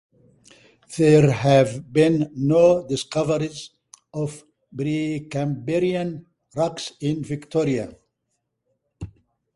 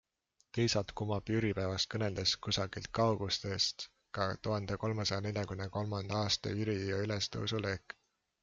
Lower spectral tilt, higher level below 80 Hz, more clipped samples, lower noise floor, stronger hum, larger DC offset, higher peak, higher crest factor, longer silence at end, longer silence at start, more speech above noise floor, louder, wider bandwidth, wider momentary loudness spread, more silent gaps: first, -6.5 dB/octave vs -4.5 dB/octave; first, -54 dBFS vs -60 dBFS; neither; about the same, -76 dBFS vs -77 dBFS; neither; neither; first, -2 dBFS vs -16 dBFS; about the same, 20 dB vs 20 dB; second, 0.5 s vs 0.65 s; first, 0.9 s vs 0.55 s; first, 56 dB vs 42 dB; first, -21 LUFS vs -35 LUFS; first, 11.5 kHz vs 7.6 kHz; first, 21 LU vs 6 LU; neither